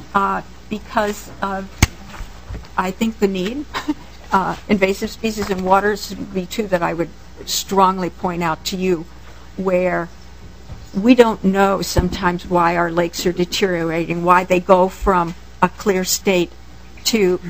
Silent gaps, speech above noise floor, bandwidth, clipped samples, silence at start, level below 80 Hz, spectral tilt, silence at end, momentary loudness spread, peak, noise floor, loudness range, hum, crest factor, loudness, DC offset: none; 21 dB; 15.5 kHz; under 0.1%; 0 s; -36 dBFS; -4.5 dB/octave; 0 s; 12 LU; 0 dBFS; -39 dBFS; 5 LU; none; 18 dB; -18 LUFS; 1%